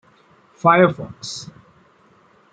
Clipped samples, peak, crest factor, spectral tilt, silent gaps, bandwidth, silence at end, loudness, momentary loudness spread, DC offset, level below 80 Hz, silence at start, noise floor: under 0.1%; -2 dBFS; 20 dB; -5.5 dB/octave; none; 9.4 kHz; 1.1 s; -18 LUFS; 19 LU; under 0.1%; -62 dBFS; 0.65 s; -54 dBFS